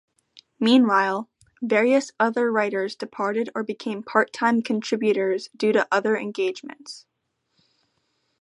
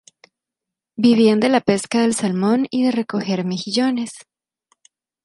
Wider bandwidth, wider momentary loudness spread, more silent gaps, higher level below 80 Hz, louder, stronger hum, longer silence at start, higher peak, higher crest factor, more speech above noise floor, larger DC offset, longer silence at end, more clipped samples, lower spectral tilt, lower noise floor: about the same, 11 kHz vs 11.5 kHz; first, 13 LU vs 8 LU; neither; second, -76 dBFS vs -64 dBFS; second, -23 LUFS vs -18 LUFS; neither; second, 0.35 s vs 1 s; about the same, -2 dBFS vs -2 dBFS; about the same, 20 dB vs 16 dB; second, 49 dB vs 68 dB; neither; first, 1.4 s vs 1.05 s; neither; about the same, -5 dB/octave vs -5 dB/octave; second, -72 dBFS vs -85 dBFS